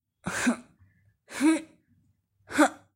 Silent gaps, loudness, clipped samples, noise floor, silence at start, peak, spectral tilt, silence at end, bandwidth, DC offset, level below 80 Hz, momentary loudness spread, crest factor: none; -27 LUFS; under 0.1%; -68 dBFS; 0.25 s; -8 dBFS; -3.5 dB/octave; 0.2 s; 16 kHz; under 0.1%; -64 dBFS; 11 LU; 22 dB